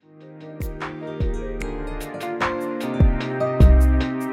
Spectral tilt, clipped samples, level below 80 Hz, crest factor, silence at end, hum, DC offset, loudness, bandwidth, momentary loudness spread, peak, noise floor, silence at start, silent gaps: -7.5 dB/octave; under 0.1%; -22 dBFS; 16 dB; 0 s; none; under 0.1%; -22 LUFS; 14 kHz; 16 LU; -4 dBFS; -42 dBFS; 0.2 s; none